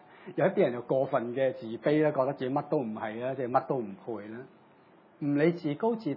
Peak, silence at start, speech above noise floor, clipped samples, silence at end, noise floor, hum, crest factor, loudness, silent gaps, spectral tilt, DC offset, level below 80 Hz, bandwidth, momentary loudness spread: -10 dBFS; 0.1 s; 30 dB; under 0.1%; 0 s; -59 dBFS; none; 20 dB; -30 LUFS; none; -10 dB/octave; under 0.1%; -82 dBFS; 6 kHz; 13 LU